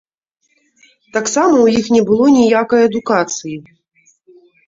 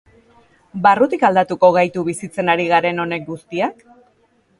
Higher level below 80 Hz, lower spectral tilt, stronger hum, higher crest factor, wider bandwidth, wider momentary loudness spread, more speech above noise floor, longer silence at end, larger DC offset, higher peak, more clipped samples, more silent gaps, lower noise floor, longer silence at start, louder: first, -54 dBFS vs -60 dBFS; about the same, -4.5 dB/octave vs -5.5 dB/octave; neither; about the same, 14 dB vs 18 dB; second, 7.8 kHz vs 11.5 kHz; about the same, 12 LU vs 10 LU; first, 53 dB vs 42 dB; first, 1.05 s vs 0.9 s; neither; about the same, -2 dBFS vs 0 dBFS; neither; neither; first, -66 dBFS vs -59 dBFS; first, 1.15 s vs 0.75 s; first, -13 LUFS vs -17 LUFS